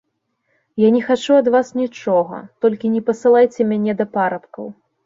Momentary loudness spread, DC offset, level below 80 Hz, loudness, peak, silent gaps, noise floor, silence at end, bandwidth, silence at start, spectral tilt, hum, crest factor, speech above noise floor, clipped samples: 14 LU; under 0.1%; -64 dBFS; -17 LUFS; -2 dBFS; none; -69 dBFS; 0.35 s; 7.8 kHz; 0.75 s; -6.5 dB/octave; none; 14 dB; 53 dB; under 0.1%